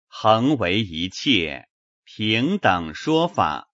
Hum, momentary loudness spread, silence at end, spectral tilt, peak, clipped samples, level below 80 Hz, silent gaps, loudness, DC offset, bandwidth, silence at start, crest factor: none; 8 LU; 0.1 s; -5.5 dB/octave; 0 dBFS; under 0.1%; -52 dBFS; 1.70-2.03 s; -21 LUFS; under 0.1%; 8 kHz; 0.15 s; 20 dB